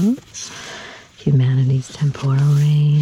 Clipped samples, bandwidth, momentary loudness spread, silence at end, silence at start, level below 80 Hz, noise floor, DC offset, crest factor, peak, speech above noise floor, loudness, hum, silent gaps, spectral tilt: under 0.1%; 10 kHz; 17 LU; 0 s; 0 s; -54 dBFS; -37 dBFS; under 0.1%; 12 dB; -6 dBFS; 21 dB; -17 LUFS; none; none; -7 dB/octave